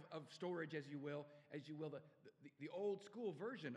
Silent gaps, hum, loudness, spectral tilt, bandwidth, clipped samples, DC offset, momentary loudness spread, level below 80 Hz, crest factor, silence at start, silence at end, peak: none; none; -50 LUFS; -6.5 dB/octave; 11 kHz; under 0.1%; under 0.1%; 11 LU; under -90 dBFS; 16 dB; 0 s; 0 s; -34 dBFS